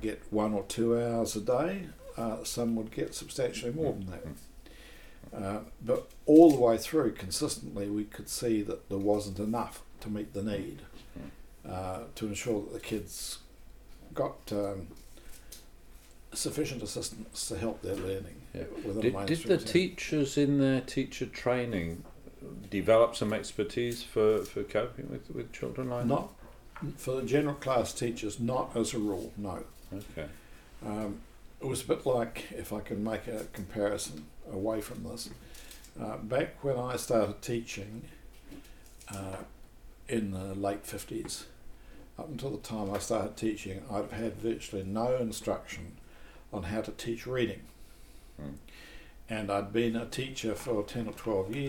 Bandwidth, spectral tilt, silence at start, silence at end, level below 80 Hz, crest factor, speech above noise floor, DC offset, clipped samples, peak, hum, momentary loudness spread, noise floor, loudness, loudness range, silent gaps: 18.5 kHz; -5.5 dB/octave; 0 s; 0 s; -52 dBFS; 26 dB; 20 dB; under 0.1%; under 0.1%; -8 dBFS; none; 18 LU; -52 dBFS; -32 LUFS; 11 LU; none